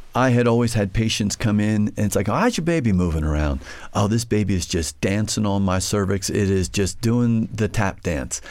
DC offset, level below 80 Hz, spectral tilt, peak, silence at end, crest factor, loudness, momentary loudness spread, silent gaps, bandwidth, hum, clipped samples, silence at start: under 0.1%; -34 dBFS; -5.5 dB/octave; -6 dBFS; 0 s; 14 dB; -21 LUFS; 5 LU; none; 16.5 kHz; none; under 0.1%; 0 s